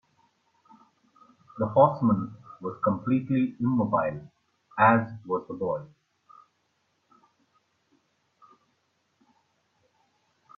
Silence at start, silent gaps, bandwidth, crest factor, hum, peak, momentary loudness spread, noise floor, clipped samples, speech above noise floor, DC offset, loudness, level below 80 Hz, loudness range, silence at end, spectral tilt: 1.55 s; none; 4.9 kHz; 24 dB; none; -6 dBFS; 17 LU; -73 dBFS; under 0.1%; 48 dB; under 0.1%; -26 LUFS; -68 dBFS; 12 LU; 4.7 s; -10.5 dB/octave